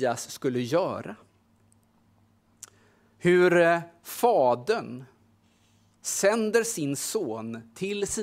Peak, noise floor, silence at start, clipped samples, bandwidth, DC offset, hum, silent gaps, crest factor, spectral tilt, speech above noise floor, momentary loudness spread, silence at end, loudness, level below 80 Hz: -8 dBFS; -64 dBFS; 0 s; under 0.1%; 16 kHz; under 0.1%; none; none; 20 dB; -4.5 dB/octave; 38 dB; 16 LU; 0 s; -26 LUFS; -66 dBFS